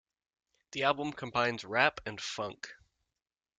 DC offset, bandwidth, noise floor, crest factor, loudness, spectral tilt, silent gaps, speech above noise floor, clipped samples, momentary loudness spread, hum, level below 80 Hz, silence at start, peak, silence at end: under 0.1%; 9.4 kHz; under -90 dBFS; 26 dB; -32 LUFS; -3.5 dB/octave; none; over 57 dB; under 0.1%; 14 LU; none; -68 dBFS; 0.75 s; -10 dBFS; 0.85 s